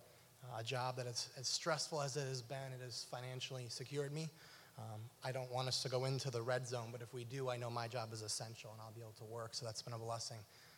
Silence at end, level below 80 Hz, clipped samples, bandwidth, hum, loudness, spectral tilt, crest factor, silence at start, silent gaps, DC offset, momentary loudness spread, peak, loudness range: 0 s; -86 dBFS; under 0.1%; 17 kHz; none; -44 LUFS; -3.5 dB/octave; 20 dB; 0 s; none; under 0.1%; 13 LU; -26 dBFS; 4 LU